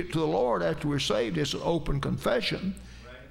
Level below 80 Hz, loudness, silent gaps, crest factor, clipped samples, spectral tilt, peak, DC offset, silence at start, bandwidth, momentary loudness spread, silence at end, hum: -42 dBFS; -28 LUFS; none; 16 dB; under 0.1%; -5.5 dB/octave; -12 dBFS; under 0.1%; 0 s; 16 kHz; 11 LU; 0 s; none